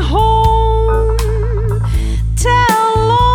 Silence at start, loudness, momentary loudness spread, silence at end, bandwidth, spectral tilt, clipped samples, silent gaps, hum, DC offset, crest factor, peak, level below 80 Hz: 0 s; -13 LUFS; 6 LU; 0 s; 18 kHz; -5.5 dB/octave; under 0.1%; none; none; under 0.1%; 12 dB; 0 dBFS; -16 dBFS